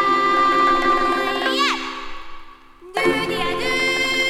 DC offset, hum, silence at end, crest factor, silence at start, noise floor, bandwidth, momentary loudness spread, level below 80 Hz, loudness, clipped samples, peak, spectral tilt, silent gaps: under 0.1%; none; 0 s; 16 dB; 0 s; -42 dBFS; 16.5 kHz; 13 LU; -42 dBFS; -19 LUFS; under 0.1%; -4 dBFS; -3 dB/octave; none